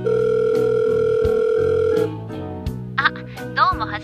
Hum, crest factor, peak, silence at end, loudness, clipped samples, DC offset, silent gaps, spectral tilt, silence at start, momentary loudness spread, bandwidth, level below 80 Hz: none; 18 dB; -2 dBFS; 0 s; -19 LUFS; under 0.1%; under 0.1%; none; -6.5 dB/octave; 0 s; 11 LU; 10.5 kHz; -40 dBFS